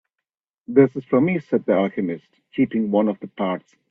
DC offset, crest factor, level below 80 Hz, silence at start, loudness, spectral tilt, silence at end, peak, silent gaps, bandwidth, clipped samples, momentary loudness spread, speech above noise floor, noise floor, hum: under 0.1%; 20 dB; -64 dBFS; 0.7 s; -21 LUFS; -10 dB/octave; 0.3 s; -2 dBFS; none; 3.9 kHz; under 0.1%; 11 LU; 64 dB; -85 dBFS; none